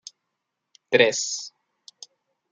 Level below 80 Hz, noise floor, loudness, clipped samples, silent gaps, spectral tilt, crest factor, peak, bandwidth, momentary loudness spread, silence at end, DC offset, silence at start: -76 dBFS; -81 dBFS; -22 LUFS; under 0.1%; none; -2 dB/octave; 24 dB; -4 dBFS; 9.6 kHz; 26 LU; 1.05 s; under 0.1%; 0.9 s